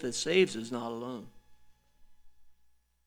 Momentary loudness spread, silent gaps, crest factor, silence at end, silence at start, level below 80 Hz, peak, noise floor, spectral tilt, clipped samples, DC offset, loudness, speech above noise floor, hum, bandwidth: 15 LU; none; 24 dB; 0.55 s; 0 s; -66 dBFS; -12 dBFS; -66 dBFS; -3.5 dB/octave; under 0.1%; under 0.1%; -31 LUFS; 35 dB; 60 Hz at -65 dBFS; 14 kHz